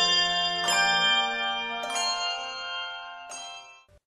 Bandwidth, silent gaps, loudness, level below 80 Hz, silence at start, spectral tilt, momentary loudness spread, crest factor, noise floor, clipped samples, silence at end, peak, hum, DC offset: 15 kHz; none; -25 LUFS; -64 dBFS; 0 s; 0 dB/octave; 18 LU; 16 dB; -50 dBFS; under 0.1%; 0.3 s; -10 dBFS; none; under 0.1%